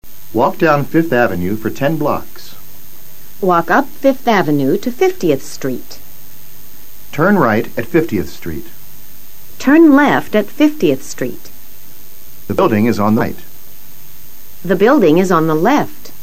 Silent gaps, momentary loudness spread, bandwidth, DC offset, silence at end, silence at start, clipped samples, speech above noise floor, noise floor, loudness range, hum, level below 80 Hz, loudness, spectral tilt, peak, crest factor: none; 17 LU; 16.5 kHz; 8%; 0.1 s; 0 s; under 0.1%; 26 dB; -39 dBFS; 4 LU; none; -46 dBFS; -14 LUFS; -6.5 dB/octave; 0 dBFS; 16 dB